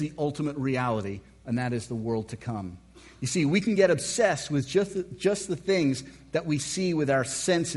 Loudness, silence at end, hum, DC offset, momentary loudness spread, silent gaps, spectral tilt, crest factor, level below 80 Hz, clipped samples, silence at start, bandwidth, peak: -27 LUFS; 0 s; none; under 0.1%; 11 LU; none; -5 dB/octave; 18 dB; -58 dBFS; under 0.1%; 0 s; 11.5 kHz; -8 dBFS